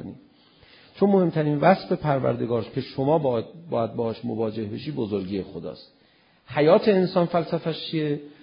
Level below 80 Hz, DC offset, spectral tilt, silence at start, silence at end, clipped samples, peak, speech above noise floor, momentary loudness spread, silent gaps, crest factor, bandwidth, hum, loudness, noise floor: -58 dBFS; under 0.1%; -11.5 dB/octave; 0 s; 0.1 s; under 0.1%; -4 dBFS; 36 dB; 12 LU; none; 20 dB; 5.4 kHz; none; -24 LUFS; -60 dBFS